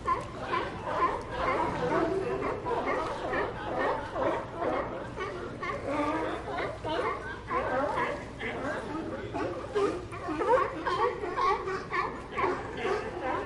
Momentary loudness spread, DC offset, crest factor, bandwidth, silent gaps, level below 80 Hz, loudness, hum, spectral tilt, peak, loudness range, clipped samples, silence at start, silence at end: 7 LU; under 0.1%; 18 dB; 11.5 kHz; none; -50 dBFS; -32 LUFS; none; -6 dB/octave; -14 dBFS; 3 LU; under 0.1%; 0 s; 0 s